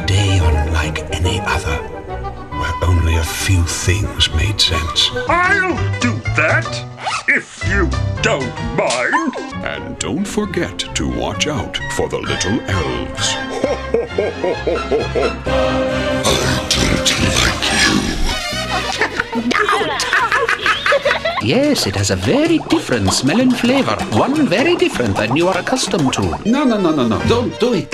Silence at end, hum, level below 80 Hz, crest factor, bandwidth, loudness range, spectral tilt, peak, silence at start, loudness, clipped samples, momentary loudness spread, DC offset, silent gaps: 0 s; none; -28 dBFS; 16 dB; 15.5 kHz; 4 LU; -4 dB/octave; 0 dBFS; 0 s; -16 LUFS; under 0.1%; 7 LU; under 0.1%; none